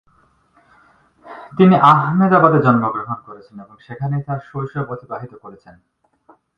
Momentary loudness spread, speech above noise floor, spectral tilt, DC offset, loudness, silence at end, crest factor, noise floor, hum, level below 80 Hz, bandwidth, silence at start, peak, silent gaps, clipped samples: 25 LU; 41 dB; -9.5 dB/octave; under 0.1%; -15 LUFS; 1.05 s; 18 dB; -57 dBFS; none; -56 dBFS; 5.2 kHz; 1.25 s; 0 dBFS; none; under 0.1%